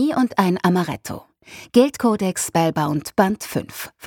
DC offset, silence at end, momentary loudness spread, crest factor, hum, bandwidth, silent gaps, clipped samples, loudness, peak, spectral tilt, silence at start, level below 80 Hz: under 0.1%; 0 s; 14 LU; 18 dB; none; 19 kHz; none; under 0.1%; -20 LUFS; -2 dBFS; -5.5 dB/octave; 0 s; -56 dBFS